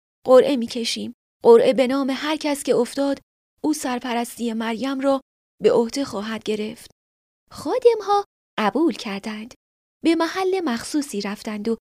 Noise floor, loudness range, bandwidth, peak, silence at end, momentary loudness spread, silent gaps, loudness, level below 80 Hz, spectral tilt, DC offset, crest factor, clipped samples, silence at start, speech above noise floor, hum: under -90 dBFS; 4 LU; 15.5 kHz; -2 dBFS; 0.1 s; 14 LU; 1.14-1.40 s, 3.23-3.57 s, 5.22-5.58 s, 6.92-7.47 s, 8.26-8.57 s, 9.56-10.00 s; -21 LUFS; -62 dBFS; -4 dB/octave; under 0.1%; 20 dB; under 0.1%; 0.25 s; over 70 dB; none